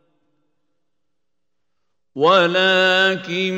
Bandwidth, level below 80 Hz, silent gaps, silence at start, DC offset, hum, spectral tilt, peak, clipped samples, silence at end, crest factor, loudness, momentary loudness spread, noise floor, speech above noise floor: 16 kHz; -74 dBFS; none; 2.15 s; under 0.1%; none; -4.5 dB/octave; -2 dBFS; under 0.1%; 0 s; 18 dB; -15 LUFS; 5 LU; -81 dBFS; 64 dB